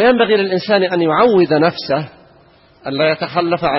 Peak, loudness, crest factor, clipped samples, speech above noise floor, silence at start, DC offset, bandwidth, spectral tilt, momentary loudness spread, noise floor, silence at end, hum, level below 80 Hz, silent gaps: 0 dBFS; -15 LUFS; 14 dB; under 0.1%; 34 dB; 0 s; under 0.1%; 6 kHz; -9 dB/octave; 9 LU; -48 dBFS; 0 s; none; -52 dBFS; none